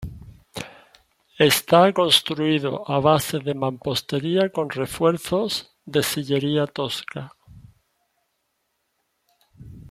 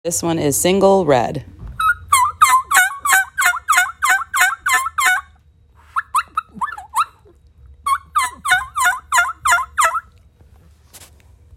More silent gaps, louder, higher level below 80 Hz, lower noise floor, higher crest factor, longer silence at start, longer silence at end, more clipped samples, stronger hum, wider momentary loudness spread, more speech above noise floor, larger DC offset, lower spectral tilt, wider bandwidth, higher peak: neither; second, -21 LUFS vs -16 LUFS; second, -54 dBFS vs -46 dBFS; first, -73 dBFS vs -50 dBFS; about the same, 22 dB vs 18 dB; about the same, 0 s vs 0.05 s; second, 0.05 s vs 0.5 s; neither; neither; first, 20 LU vs 12 LU; first, 52 dB vs 35 dB; neither; first, -4.5 dB/octave vs -2.5 dB/octave; about the same, 16 kHz vs 17 kHz; about the same, -2 dBFS vs 0 dBFS